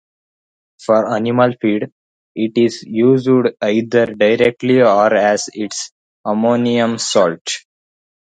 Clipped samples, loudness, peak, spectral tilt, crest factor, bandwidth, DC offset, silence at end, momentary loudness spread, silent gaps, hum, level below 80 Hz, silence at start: under 0.1%; -15 LUFS; 0 dBFS; -5 dB/octave; 16 dB; 9.4 kHz; under 0.1%; 0.7 s; 12 LU; 1.92-2.35 s, 5.92-6.24 s, 7.41-7.45 s; none; -60 dBFS; 0.8 s